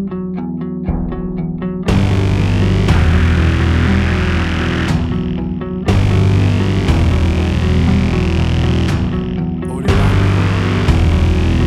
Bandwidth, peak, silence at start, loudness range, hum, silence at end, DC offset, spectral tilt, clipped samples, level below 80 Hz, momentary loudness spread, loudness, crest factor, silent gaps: 10.5 kHz; 0 dBFS; 0 s; 1 LU; none; 0 s; under 0.1%; -7 dB/octave; under 0.1%; -20 dBFS; 8 LU; -15 LUFS; 14 dB; none